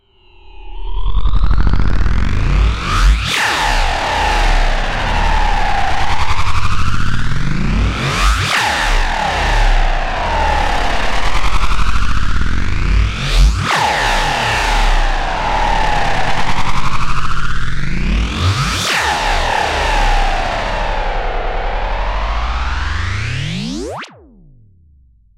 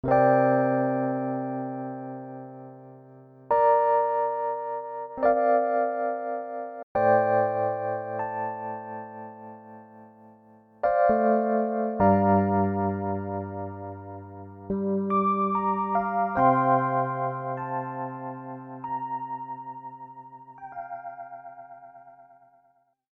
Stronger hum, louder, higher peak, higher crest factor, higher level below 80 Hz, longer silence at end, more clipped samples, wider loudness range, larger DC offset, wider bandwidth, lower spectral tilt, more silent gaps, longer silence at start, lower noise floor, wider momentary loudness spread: neither; first, -17 LUFS vs -26 LUFS; first, -2 dBFS vs -8 dBFS; second, 10 dB vs 20 dB; first, -18 dBFS vs -60 dBFS; first, 1.3 s vs 0.9 s; neither; second, 4 LU vs 12 LU; neither; first, 13.5 kHz vs 4.6 kHz; second, -4 dB/octave vs -11 dB/octave; second, none vs 6.83-6.95 s; first, 0.45 s vs 0.05 s; second, -48 dBFS vs -66 dBFS; second, 7 LU vs 21 LU